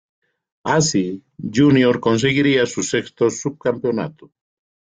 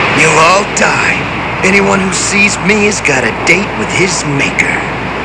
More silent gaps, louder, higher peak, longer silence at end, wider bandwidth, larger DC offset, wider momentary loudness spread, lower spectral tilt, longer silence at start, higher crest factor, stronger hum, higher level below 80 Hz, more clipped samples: neither; second, -18 LUFS vs -9 LUFS; second, -4 dBFS vs 0 dBFS; first, 0.6 s vs 0 s; second, 9.4 kHz vs 11 kHz; neither; first, 11 LU vs 5 LU; first, -5 dB/octave vs -3.5 dB/octave; first, 0.65 s vs 0 s; first, 16 dB vs 10 dB; neither; second, -56 dBFS vs -34 dBFS; second, under 0.1% vs 0.5%